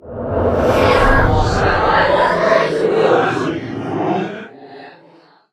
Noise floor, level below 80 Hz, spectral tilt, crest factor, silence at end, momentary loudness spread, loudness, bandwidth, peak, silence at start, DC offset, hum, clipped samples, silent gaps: -48 dBFS; -26 dBFS; -6 dB/octave; 16 dB; 0.65 s; 11 LU; -15 LUFS; 14 kHz; 0 dBFS; 0.05 s; under 0.1%; none; under 0.1%; none